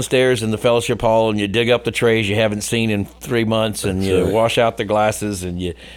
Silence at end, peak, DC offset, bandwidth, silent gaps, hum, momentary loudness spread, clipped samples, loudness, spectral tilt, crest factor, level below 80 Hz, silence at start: 0 s; -4 dBFS; under 0.1%; 18.5 kHz; none; none; 7 LU; under 0.1%; -18 LUFS; -5 dB/octave; 14 dB; -42 dBFS; 0 s